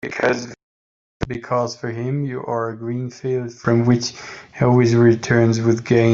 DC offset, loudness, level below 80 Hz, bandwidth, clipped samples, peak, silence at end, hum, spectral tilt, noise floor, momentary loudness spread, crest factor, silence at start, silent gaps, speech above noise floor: under 0.1%; -19 LUFS; -48 dBFS; 7.6 kHz; under 0.1%; -2 dBFS; 0 s; none; -6.5 dB/octave; under -90 dBFS; 13 LU; 16 dB; 0.05 s; 0.63-1.20 s; over 72 dB